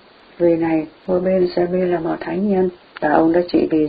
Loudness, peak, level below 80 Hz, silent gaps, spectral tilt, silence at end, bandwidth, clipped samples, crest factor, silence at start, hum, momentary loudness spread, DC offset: -18 LUFS; 0 dBFS; -50 dBFS; none; -11.5 dB/octave; 0 s; 5 kHz; under 0.1%; 18 dB; 0.4 s; none; 7 LU; under 0.1%